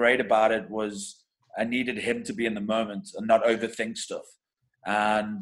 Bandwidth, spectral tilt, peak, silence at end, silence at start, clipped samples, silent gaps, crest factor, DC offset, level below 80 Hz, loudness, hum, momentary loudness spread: 12 kHz; -4 dB/octave; -8 dBFS; 0 s; 0 s; under 0.1%; none; 20 dB; under 0.1%; -64 dBFS; -27 LUFS; none; 14 LU